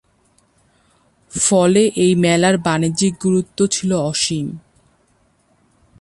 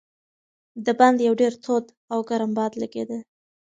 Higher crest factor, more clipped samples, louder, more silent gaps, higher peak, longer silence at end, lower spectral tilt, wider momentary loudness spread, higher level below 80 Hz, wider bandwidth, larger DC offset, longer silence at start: second, 16 dB vs 22 dB; neither; first, -16 LUFS vs -23 LUFS; second, none vs 1.97-2.08 s; about the same, -2 dBFS vs -2 dBFS; first, 1.4 s vs 0.4 s; about the same, -4.5 dB/octave vs -5.5 dB/octave; second, 9 LU vs 14 LU; first, -52 dBFS vs -72 dBFS; first, 11.5 kHz vs 9.2 kHz; neither; first, 1.35 s vs 0.75 s